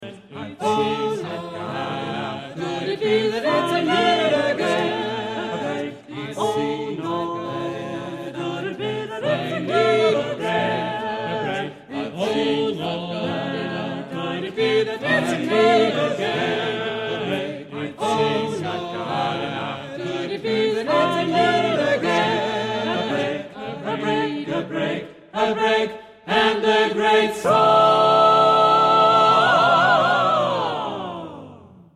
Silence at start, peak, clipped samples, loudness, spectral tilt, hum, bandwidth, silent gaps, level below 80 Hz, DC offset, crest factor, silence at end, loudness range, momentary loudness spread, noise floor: 0 s; -4 dBFS; under 0.1%; -21 LUFS; -5 dB/octave; none; 13 kHz; none; -60 dBFS; under 0.1%; 16 dB; 0.25 s; 10 LU; 15 LU; -44 dBFS